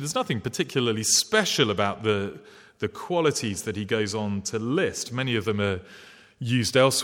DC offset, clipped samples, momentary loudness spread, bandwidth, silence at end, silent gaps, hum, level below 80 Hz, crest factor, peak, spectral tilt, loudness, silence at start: under 0.1%; under 0.1%; 10 LU; 17.5 kHz; 0 s; none; none; -62 dBFS; 20 dB; -6 dBFS; -3.5 dB/octave; -25 LUFS; 0 s